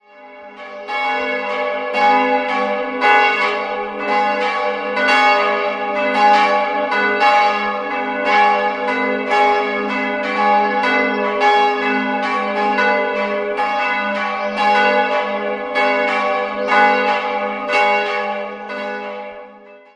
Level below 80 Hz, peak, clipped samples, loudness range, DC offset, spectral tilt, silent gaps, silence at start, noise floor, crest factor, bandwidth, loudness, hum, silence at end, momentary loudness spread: -60 dBFS; 0 dBFS; under 0.1%; 2 LU; under 0.1%; -4 dB/octave; none; 0.15 s; -41 dBFS; 16 dB; 10.5 kHz; -16 LUFS; none; 0.2 s; 8 LU